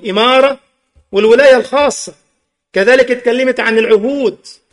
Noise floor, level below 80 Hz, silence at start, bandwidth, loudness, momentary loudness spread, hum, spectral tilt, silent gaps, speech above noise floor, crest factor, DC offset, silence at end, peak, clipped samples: -65 dBFS; -52 dBFS; 0.05 s; 11.5 kHz; -11 LUFS; 11 LU; none; -3.5 dB/octave; none; 54 dB; 12 dB; under 0.1%; 0.2 s; 0 dBFS; under 0.1%